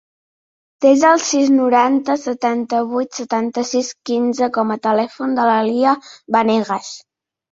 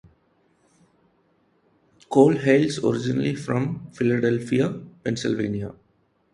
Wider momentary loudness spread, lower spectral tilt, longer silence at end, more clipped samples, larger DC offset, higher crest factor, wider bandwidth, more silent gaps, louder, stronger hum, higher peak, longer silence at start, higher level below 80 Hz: second, 8 LU vs 12 LU; second, -4 dB/octave vs -6.5 dB/octave; about the same, 0.55 s vs 0.6 s; neither; neither; second, 16 dB vs 22 dB; second, 7.8 kHz vs 11.5 kHz; neither; first, -17 LUFS vs -23 LUFS; neither; about the same, -2 dBFS vs -2 dBFS; second, 0.8 s vs 2.1 s; second, -64 dBFS vs -58 dBFS